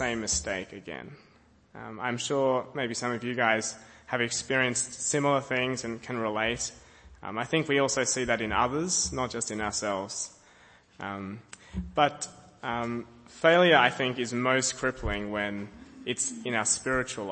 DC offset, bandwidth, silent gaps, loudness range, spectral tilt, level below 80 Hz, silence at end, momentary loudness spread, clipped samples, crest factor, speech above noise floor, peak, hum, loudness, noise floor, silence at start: under 0.1%; 8.8 kHz; none; 6 LU; -3 dB/octave; -52 dBFS; 0 s; 14 LU; under 0.1%; 24 dB; 29 dB; -6 dBFS; none; -28 LUFS; -57 dBFS; 0 s